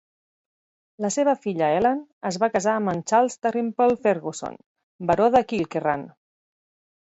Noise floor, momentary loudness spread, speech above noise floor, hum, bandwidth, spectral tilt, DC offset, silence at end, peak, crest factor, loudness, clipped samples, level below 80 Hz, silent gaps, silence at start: under -90 dBFS; 11 LU; over 68 dB; none; 8.2 kHz; -5 dB/octave; under 0.1%; 0.95 s; -6 dBFS; 18 dB; -23 LUFS; under 0.1%; -60 dBFS; 2.13-2.21 s, 4.66-4.75 s, 4.83-4.99 s; 1 s